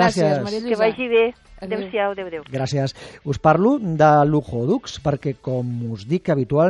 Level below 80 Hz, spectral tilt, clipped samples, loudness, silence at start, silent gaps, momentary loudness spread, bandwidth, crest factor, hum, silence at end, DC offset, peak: -48 dBFS; -7 dB/octave; under 0.1%; -20 LUFS; 0 s; none; 12 LU; 11 kHz; 18 dB; none; 0 s; under 0.1%; -2 dBFS